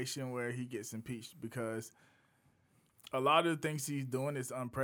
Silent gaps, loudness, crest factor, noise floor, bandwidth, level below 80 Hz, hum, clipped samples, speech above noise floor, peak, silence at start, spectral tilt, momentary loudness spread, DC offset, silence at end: none; -37 LUFS; 22 dB; -72 dBFS; over 20 kHz; -74 dBFS; none; under 0.1%; 35 dB; -16 dBFS; 0 s; -4.5 dB/octave; 15 LU; under 0.1%; 0 s